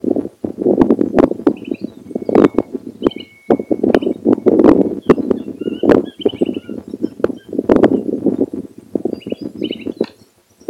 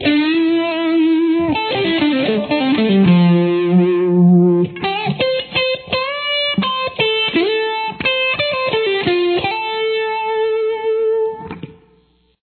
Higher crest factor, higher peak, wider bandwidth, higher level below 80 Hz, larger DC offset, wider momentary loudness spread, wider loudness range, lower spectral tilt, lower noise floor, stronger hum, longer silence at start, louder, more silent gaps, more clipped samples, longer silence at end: about the same, 16 dB vs 14 dB; about the same, 0 dBFS vs -2 dBFS; first, 11.5 kHz vs 4.5 kHz; first, -44 dBFS vs -52 dBFS; neither; first, 13 LU vs 7 LU; about the same, 4 LU vs 4 LU; second, -8 dB/octave vs -9.5 dB/octave; second, -50 dBFS vs -56 dBFS; neither; about the same, 0.05 s vs 0 s; about the same, -16 LUFS vs -16 LUFS; neither; first, 0.8% vs under 0.1%; about the same, 0.65 s vs 0.7 s